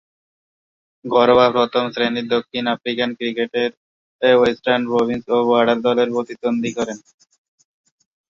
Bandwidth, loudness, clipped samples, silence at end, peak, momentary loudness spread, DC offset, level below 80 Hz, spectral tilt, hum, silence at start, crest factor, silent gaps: 7.4 kHz; -18 LUFS; under 0.1%; 1.3 s; -2 dBFS; 9 LU; under 0.1%; -58 dBFS; -5 dB/octave; none; 1.05 s; 18 dB; 3.77-4.19 s